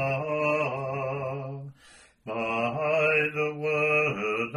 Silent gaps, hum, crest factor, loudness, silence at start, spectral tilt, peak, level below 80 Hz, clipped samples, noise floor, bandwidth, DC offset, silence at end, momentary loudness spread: none; none; 16 dB; -27 LUFS; 0 s; -6.5 dB/octave; -12 dBFS; -66 dBFS; under 0.1%; -56 dBFS; 11.5 kHz; under 0.1%; 0 s; 14 LU